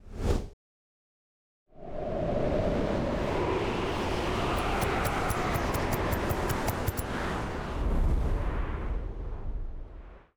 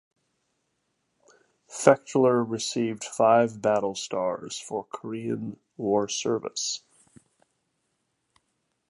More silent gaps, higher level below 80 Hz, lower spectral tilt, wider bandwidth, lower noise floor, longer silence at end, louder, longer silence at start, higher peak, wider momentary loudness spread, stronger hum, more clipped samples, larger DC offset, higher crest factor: first, 0.53-1.66 s vs none; first, -34 dBFS vs -72 dBFS; first, -6 dB/octave vs -4 dB/octave; first, over 20 kHz vs 11.5 kHz; first, under -90 dBFS vs -76 dBFS; second, 0.2 s vs 2.1 s; second, -31 LUFS vs -26 LUFS; second, 0.05 s vs 1.7 s; second, -14 dBFS vs -2 dBFS; about the same, 11 LU vs 13 LU; neither; neither; neither; second, 16 dB vs 26 dB